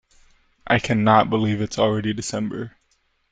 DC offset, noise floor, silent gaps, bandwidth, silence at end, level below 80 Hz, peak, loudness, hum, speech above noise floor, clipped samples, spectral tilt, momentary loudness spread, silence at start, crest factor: under 0.1%; -66 dBFS; none; 9.4 kHz; 0.6 s; -50 dBFS; -2 dBFS; -21 LUFS; none; 46 dB; under 0.1%; -5.5 dB/octave; 12 LU; 0.65 s; 20 dB